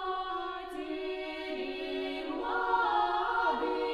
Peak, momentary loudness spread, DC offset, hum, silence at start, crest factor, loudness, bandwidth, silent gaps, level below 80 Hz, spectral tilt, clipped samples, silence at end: -18 dBFS; 9 LU; under 0.1%; none; 0 s; 16 dB; -33 LUFS; 12.5 kHz; none; -60 dBFS; -4 dB/octave; under 0.1%; 0 s